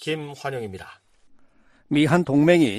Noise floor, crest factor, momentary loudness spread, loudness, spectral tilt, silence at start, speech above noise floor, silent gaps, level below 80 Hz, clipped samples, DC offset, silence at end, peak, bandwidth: -55 dBFS; 18 dB; 17 LU; -21 LUFS; -6.5 dB/octave; 0 s; 34 dB; none; -60 dBFS; under 0.1%; under 0.1%; 0 s; -4 dBFS; 13.5 kHz